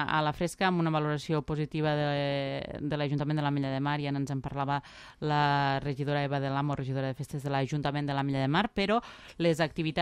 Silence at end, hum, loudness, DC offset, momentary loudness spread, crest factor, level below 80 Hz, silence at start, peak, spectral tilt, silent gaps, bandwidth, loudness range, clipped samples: 0 s; none; -30 LUFS; under 0.1%; 6 LU; 16 dB; -56 dBFS; 0 s; -12 dBFS; -6.5 dB/octave; none; 13 kHz; 1 LU; under 0.1%